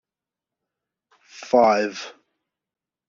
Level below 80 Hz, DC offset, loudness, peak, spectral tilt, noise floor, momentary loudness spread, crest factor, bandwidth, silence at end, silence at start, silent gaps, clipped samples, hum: -68 dBFS; under 0.1%; -20 LUFS; -4 dBFS; -2.5 dB/octave; -89 dBFS; 22 LU; 22 dB; 7.4 kHz; 1 s; 1.4 s; none; under 0.1%; none